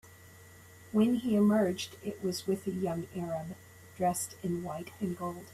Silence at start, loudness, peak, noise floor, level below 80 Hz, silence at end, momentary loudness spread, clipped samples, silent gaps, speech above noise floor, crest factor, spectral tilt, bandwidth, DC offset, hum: 0.05 s; -32 LUFS; -16 dBFS; -54 dBFS; -66 dBFS; 0 s; 12 LU; under 0.1%; none; 23 dB; 16 dB; -6 dB/octave; 15.5 kHz; under 0.1%; none